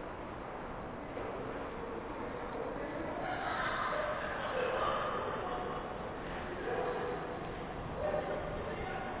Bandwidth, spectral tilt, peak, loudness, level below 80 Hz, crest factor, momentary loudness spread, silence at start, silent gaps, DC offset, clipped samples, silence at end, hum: 4 kHz; -4 dB/octave; -22 dBFS; -38 LUFS; -54 dBFS; 16 dB; 8 LU; 0 s; none; under 0.1%; under 0.1%; 0 s; none